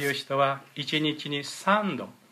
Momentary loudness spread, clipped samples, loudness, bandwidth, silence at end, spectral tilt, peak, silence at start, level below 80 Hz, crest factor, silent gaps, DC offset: 8 LU; under 0.1%; -27 LUFS; 15.5 kHz; 0.2 s; -4.5 dB/octave; -10 dBFS; 0 s; -78 dBFS; 18 dB; none; under 0.1%